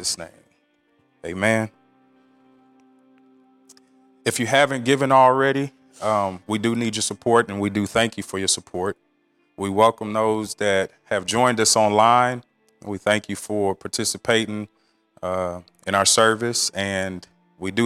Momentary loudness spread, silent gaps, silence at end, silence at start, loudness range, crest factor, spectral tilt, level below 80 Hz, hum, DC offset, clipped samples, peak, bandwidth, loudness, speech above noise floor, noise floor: 16 LU; none; 0 s; 0 s; 9 LU; 20 dB; -3.5 dB/octave; -62 dBFS; none; under 0.1%; under 0.1%; -4 dBFS; 16 kHz; -21 LUFS; 44 dB; -65 dBFS